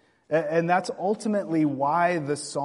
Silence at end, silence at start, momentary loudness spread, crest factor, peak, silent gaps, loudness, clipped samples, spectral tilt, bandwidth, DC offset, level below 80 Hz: 0 s; 0.3 s; 5 LU; 16 dB; -8 dBFS; none; -25 LUFS; under 0.1%; -6 dB/octave; 11.5 kHz; under 0.1%; -72 dBFS